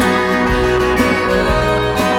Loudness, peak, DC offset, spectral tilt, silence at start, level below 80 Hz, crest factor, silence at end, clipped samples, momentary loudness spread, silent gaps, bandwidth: -14 LUFS; 0 dBFS; under 0.1%; -5.5 dB/octave; 0 s; -26 dBFS; 14 dB; 0 s; under 0.1%; 1 LU; none; 17.5 kHz